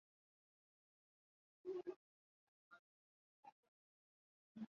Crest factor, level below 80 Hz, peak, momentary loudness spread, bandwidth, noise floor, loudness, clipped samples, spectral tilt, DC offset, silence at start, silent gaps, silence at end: 22 dB; under -90 dBFS; -38 dBFS; 18 LU; 6.8 kHz; under -90 dBFS; -53 LUFS; under 0.1%; -6.5 dB/octave; under 0.1%; 1.65 s; 1.96-2.71 s, 2.79-3.43 s, 3.52-4.55 s; 0.05 s